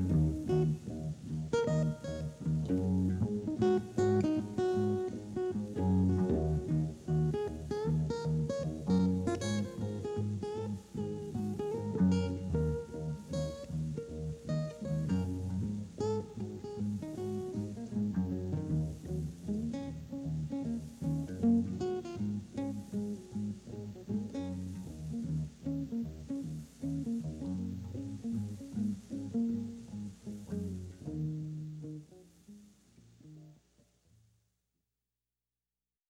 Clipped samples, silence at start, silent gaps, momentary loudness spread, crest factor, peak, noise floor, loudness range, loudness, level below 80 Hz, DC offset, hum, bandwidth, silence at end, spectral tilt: under 0.1%; 0 s; none; 11 LU; 16 dB; -18 dBFS; under -90 dBFS; 7 LU; -36 LUFS; -52 dBFS; under 0.1%; none; 11.5 kHz; 2.55 s; -8 dB/octave